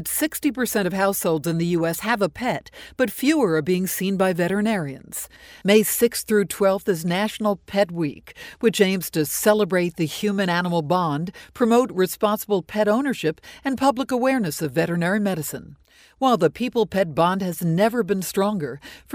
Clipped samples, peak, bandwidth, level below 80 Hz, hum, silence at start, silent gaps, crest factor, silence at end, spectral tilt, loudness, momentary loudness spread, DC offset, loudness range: under 0.1%; -4 dBFS; over 20 kHz; -56 dBFS; none; 0 s; none; 18 dB; 0 s; -5 dB/octave; -22 LUFS; 9 LU; under 0.1%; 1 LU